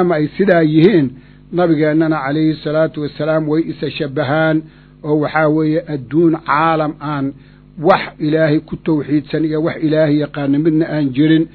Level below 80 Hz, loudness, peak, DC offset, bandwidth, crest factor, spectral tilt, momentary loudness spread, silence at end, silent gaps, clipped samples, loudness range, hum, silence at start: -48 dBFS; -15 LUFS; 0 dBFS; under 0.1%; 4.6 kHz; 14 dB; -10.5 dB/octave; 8 LU; 0.05 s; none; under 0.1%; 2 LU; 50 Hz at -40 dBFS; 0 s